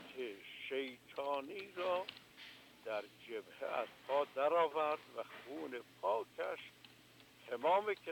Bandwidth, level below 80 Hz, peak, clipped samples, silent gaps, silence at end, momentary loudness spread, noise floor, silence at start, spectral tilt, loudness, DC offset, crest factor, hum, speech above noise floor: 19 kHz; -86 dBFS; -22 dBFS; under 0.1%; none; 0 s; 19 LU; -63 dBFS; 0 s; -4 dB/octave; -40 LUFS; under 0.1%; 18 dB; none; 24 dB